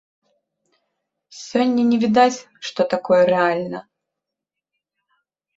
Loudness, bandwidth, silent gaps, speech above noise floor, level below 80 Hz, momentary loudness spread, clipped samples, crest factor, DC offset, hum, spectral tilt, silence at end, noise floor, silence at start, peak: -19 LUFS; 8 kHz; none; 66 dB; -66 dBFS; 15 LU; under 0.1%; 20 dB; under 0.1%; none; -5 dB/octave; 1.75 s; -84 dBFS; 1.3 s; -2 dBFS